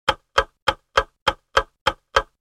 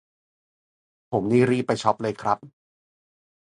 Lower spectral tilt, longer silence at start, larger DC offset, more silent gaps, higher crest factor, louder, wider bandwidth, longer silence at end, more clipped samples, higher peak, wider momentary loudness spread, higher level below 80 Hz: second, -2.5 dB/octave vs -6.5 dB/octave; second, 0.05 s vs 1.1 s; neither; first, 0.62-0.66 s, 1.22-1.26 s, 1.81-1.86 s vs none; about the same, 22 dB vs 22 dB; about the same, -23 LUFS vs -24 LUFS; first, 15.5 kHz vs 11 kHz; second, 0.2 s vs 0.95 s; neither; about the same, -2 dBFS vs -4 dBFS; second, 4 LU vs 8 LU; first, -40 dBFS vs -62 dBFS